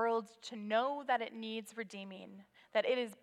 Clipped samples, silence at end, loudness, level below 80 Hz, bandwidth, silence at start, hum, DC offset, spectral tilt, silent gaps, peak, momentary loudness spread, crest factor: under 0.1%; 0.1 s; -38 LUFS; under -90 dBFS; 14 kHz; 0 s; none; under 0.1%; -4 dB/octave; none; -20 dBFS; 14 LU; 18 dB